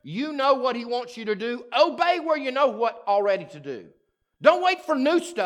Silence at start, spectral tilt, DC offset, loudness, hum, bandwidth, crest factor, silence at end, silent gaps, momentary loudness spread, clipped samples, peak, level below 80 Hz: 0.05 s; -4.5 dB/octave; under 0.1%; -23 LUFS; none; 12 kHz; 22 dB; 0 s; none; 10 LU; under 0.1%; -2 dBFS; -78 dBFS